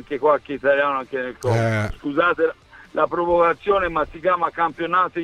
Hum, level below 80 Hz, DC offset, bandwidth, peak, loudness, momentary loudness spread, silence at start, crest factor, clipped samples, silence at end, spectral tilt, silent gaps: none; -44 dBFS; under 0.1%; 12.5 kHz; -4 dBFS; -21 LUFS; 6 LU; 0 s; 16 dB; under 0.1%; 0 s; -6.5 dB/octave; none